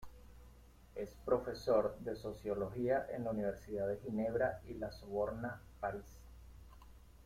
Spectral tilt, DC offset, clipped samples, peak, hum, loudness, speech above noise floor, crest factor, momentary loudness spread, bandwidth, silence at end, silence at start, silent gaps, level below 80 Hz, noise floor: -7 dB/octave; under 0.1%; under 0.1%; -20 dBFS; none; -39 LUFS; 22 dB; 20 dB; 24 LU; 16 kHz; 0 s; 0 s; none; -58 dBFS; -60 dBFS